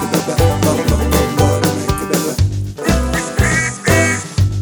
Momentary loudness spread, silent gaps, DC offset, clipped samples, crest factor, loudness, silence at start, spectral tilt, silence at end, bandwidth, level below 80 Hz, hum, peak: 4 LU; none; under 0.1%; under 0.1%; 14 dB; -15 LUFS; 0 s; -5 dB/octave; 0 s; over 20 kHz; -24 dBFS; none; 0 dBFS